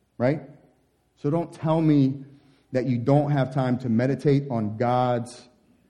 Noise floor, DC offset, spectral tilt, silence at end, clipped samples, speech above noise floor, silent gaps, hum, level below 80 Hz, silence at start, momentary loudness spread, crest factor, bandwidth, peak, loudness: -65 dBFS; 0.1%; -8.5 dB/octave; 0.5 s; under 0.1%; 42 dB; none; none; -64 dBFS; 0.2 s; 9 LU; 16 dB; 10.5 kHz; -8 dBFS; -24 LUFS